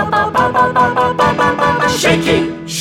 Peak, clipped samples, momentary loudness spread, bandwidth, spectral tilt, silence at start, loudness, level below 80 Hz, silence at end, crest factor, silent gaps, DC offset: 0 dBFS; under 0.1%; 3 LU; 16.5 kHz; -4.5 dB/octave; 0 s; -13 LUFS; -38 dBFS; 0 s; 12 dB; none; under 0.1%